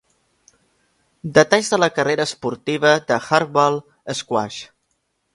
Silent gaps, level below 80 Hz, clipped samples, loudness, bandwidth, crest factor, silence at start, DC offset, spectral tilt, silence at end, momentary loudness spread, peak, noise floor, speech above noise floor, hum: none; -60 dBFS; under 0.1%; -19 LUFS; 11.5 kHz; 20 dB; 1.25 s; under 0.1%; -4 dB/octave; 0.7 s; 12 LU; 0 dBFS; -70 dBFS; 52 dB; none